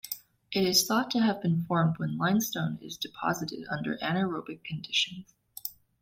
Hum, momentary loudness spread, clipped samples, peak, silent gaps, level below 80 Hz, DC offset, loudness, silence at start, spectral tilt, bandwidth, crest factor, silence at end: none; 15 LU; under 0.1%; -10 dBFS; none; -66 dBFS; under 0.1%; -29 LUFS; 0.05 s; -4 dB/octave; 16.5 kHz; 20 dB; 0.3 s